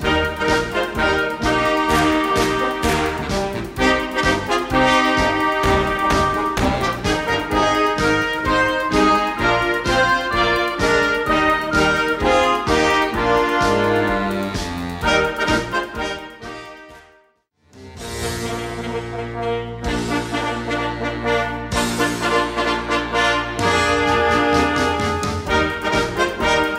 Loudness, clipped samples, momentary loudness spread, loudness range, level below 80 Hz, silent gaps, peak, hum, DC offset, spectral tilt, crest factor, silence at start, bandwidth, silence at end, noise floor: -18 LUFS; under 0.1%; 9 LU; 8 LU; -34 dBFS; none; -4 dBFS; none; under 0.1%; -4.5 dB/octave; 16 dB; 0 s; 16 kHz; 0 s; -59 dBFS